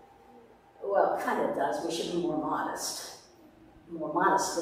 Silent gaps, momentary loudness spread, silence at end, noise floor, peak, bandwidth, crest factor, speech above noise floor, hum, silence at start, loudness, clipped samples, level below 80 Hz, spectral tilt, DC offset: none; 14 LU; 0 s; -56 dBFS; -12 dBFS; 15.5 kHz; 20 dB; 26 dB; none; 0.3 s; -30 LUFS; under 0.1%; -68 dBFS; -3.5 dB/octave; under 0.1%